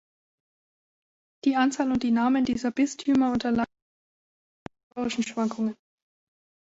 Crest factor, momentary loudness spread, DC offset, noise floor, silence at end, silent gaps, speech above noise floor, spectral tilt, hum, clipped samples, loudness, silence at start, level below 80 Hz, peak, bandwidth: 16 dB; 8 LU; under 0.1%; under -90 dBFS; 0.95 s; 3.82-4.66 s, 4.83-4.91 s; over 65 dB; -4.5 dB/octave; none; under 0.1%; -26 LUFS; 1.45 s; -60 dBFS; -12 dBFS; 8 kHz